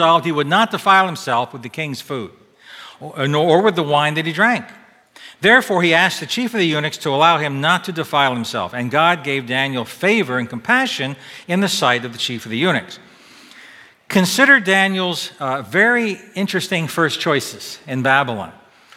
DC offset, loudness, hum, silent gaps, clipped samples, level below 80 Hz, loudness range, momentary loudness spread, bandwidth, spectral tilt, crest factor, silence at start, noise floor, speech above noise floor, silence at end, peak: under 0.1%; -17 LUFS; none; none; under 0.1%; -66 dBFS; 4 LU; 13 LU; 16.5 kHz; -4 dB/octave; 18 dB; 0 s; -44 dBFS; 27 dB; 0.45 s; 0 dBFS